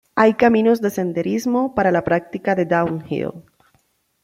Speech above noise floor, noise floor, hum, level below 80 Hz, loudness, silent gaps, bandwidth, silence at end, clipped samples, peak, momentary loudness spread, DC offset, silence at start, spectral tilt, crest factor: 45 dB; -63 dBFS; none; -54 dBFS; -19 LUFS; none; 15.5 kHz; 0.85 s; under 0.1%; -2 dBFS; 10 LU; under 0.1%; 0.15 s; -7 dB/octave; 18 dB